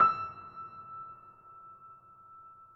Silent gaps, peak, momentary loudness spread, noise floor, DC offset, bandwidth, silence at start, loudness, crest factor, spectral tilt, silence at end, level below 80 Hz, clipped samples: none; -12 dBFS; 15 LU; -55 dBFS; under 0.1%; 5.8 kHz; 0 s; -36 LUFS; 22 dB; -6.5 dB/octave; 0.25 s; -74 dBFS; under 0.1%